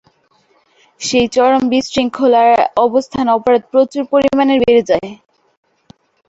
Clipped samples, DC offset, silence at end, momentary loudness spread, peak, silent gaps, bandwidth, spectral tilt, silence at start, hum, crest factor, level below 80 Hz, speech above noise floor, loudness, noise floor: under 0.1%; under 0.1%; 1.15 s; 7 LU; 0 dBFS; none; 8 kHz; -4.5 dB/octave; 1 s; none; 14 dB; -48 dBFS; 43 dB; -13 LUFS; -56 dBFS